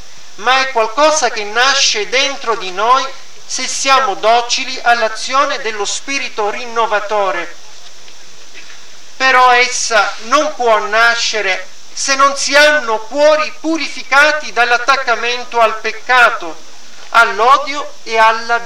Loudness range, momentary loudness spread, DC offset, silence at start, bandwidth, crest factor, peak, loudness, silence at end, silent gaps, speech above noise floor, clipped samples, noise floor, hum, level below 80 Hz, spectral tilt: 4 LU; 9 LU; 6%; 0.4 s; 16.5 kHz; 14 dB; 0 dBFS; -12 LUFS; 0 s; none; 26 dB; 0.2%; -39 dBFS; none; -60 dBFS; 0 dB/octave